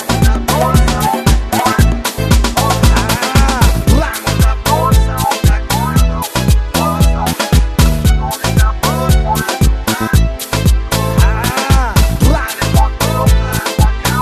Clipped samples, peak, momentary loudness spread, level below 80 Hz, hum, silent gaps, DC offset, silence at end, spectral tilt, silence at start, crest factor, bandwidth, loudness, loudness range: under 0.1%; 0 dBFS; 3 LU; -14 dBFS; none; none; under 0.1%; 0 s; -5 dB/octave; 0 s; 12 dB; 14.5 kHz; -13 LUFS; 1 LU